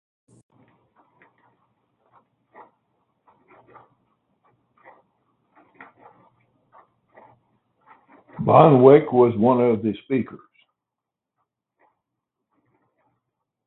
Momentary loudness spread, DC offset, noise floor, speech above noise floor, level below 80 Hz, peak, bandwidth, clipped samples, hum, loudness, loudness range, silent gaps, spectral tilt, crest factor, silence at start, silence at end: 14 LU; under 0.1%; -86 dBFS; 70 dB; -64 dBFS; 0 dBFS; 4.1 kHz; under 0.1%; none; -17 LUFS; 14 LU; none; -11 dB/octave; 24 dB; 8.4 s; 3.3 s